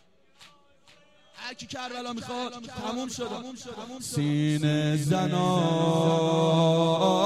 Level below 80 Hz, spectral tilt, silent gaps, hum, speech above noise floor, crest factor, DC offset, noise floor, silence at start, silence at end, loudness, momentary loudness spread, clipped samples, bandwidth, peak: -64 dBFS; -6 dB/octave; none; none; 34 dB; 16 dB; under 0.1%; -59 dBFS; 0.4 s; 0 s; -26 LUFS; 15 LU; under 0.1%; 14 kHz; -10 dBFS